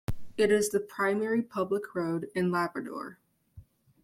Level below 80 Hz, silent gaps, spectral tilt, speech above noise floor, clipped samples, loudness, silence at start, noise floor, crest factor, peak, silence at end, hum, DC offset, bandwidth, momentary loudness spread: -54 dBFS; none; -5.5 dB/octave; 26 dB; under 0.1%; -30 LUFS; 0.1 s; -55 dBFS; 18 dB; -12 dBFS; 0.4 s; none; under 0.1%; 16 kHz; 12 LU